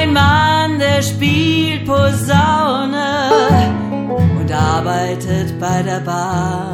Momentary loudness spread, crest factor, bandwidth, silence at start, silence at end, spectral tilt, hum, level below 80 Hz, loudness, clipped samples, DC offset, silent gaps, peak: 7 LU; 14 dB; 16 kHz; 0 s; 0 s; -5.5 dB/octave; none; -38 dBFS; -14 LUFS; under 0.1%; under 0.1%; none; 0 dBFS